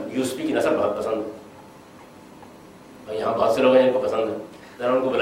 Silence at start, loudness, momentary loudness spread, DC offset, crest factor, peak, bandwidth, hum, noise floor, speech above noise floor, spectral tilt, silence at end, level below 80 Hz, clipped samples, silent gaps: 0 s; -22 LUFS; 18 LU; under 0.1%; 18 dB; -4 dBFS; 16 kHz; none; -45 dBFS; 24 dB; -5 dB/octave; 0 s; -62 dBFS; under 0.1%; none